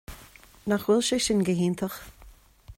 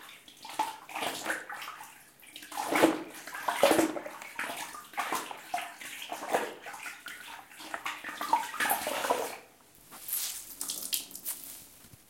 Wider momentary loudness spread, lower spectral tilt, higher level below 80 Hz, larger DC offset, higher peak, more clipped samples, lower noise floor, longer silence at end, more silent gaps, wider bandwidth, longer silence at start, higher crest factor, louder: about the same, 19 LU vs 18 LU; first, -4.5 dB/octave vs -2 dB/octave; first, -52 dBFS vs -72 dBFS; neither; second, -12 dBFS vs -8 dBFS; neither; second, -52 dBFS vs -57 dBFS; about the same, 0.05 s vs 0.15 s; neither; about the same, 16.5 kHz vs 17 kHz; about the same, 0.1 s vs 0 s; second, 16 dB vs 28 dB; first, -25 LUFS vs -33 LUFS